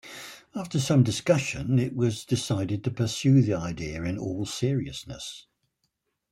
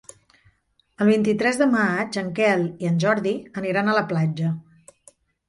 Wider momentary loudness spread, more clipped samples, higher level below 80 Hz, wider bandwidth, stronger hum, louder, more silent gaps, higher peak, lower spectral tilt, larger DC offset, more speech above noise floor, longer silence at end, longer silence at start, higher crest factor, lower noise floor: first, 16 LU vs 8 LU; neither; first, -54 dBFS vs -62 dBFS; first, 13.5 kHz vs 11.5 kHz; neither; second, -26 LUFS vs -22 LUFS; neither; about the same, -8 dBFS vs -6 dBFS; about the same, -6 dB/octave vs -6.5 dB/octave; neither; first, 52 dB vs 43 dB; about the same, 0.9 s vs 0.85 s; second, 0.05 s vs 1 s; about the same, 18 dB vs 16 dB; first, -77 dBFS vs -64 dBFS